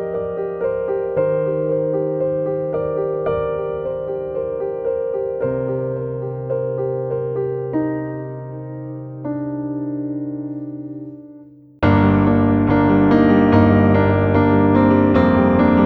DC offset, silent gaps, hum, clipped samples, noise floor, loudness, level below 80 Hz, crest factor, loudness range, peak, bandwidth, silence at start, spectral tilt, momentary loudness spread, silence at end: under 0.1%; none; none; under 0.1%; -43 dBFS; -18 LUFS; -40 dBFS; 16 dB; 11 LU; -2 dBFS; 5.4 kHz; 0 s; -10.5 dB/octave; 15 LU; 0 s